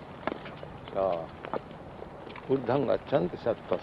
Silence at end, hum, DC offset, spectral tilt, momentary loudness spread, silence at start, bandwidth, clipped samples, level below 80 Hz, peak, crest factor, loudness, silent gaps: 0 s; none; under 0.1%; -8.5 dB/octave; 16 LU; 0 s; 6 kHz; under 0.1%; -58 dBFS; -12 dBFS; 20 dB; -31 LUFS; none